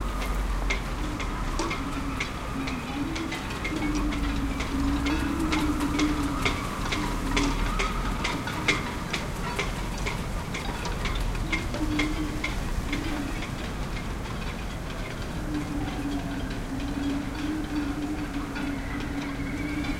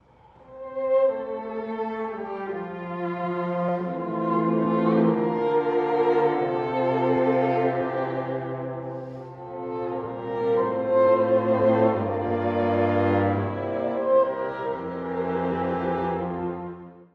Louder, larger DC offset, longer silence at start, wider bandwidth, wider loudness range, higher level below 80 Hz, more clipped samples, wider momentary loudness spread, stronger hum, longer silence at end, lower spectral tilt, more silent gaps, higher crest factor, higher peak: second, -30 LUFS vs -25 LUFS; first, 0.1% vs under 0.1%; second, 0 s vs 0.5 s; first, 16.5 kHz vs 5.4 kHz; about the same, 5 LU vs 6 LU; first, -34 dBFS vs -60 dBFS; neither; second, 7 LU vs 11 LU; neither; about the same, 0 s vs 0.1 s; second, -5 dB/octave vs -9.5 dB/octave; neither; about the same, 20 dB vs 16 dB; about the same, -8 dBFS vs -10 dBFS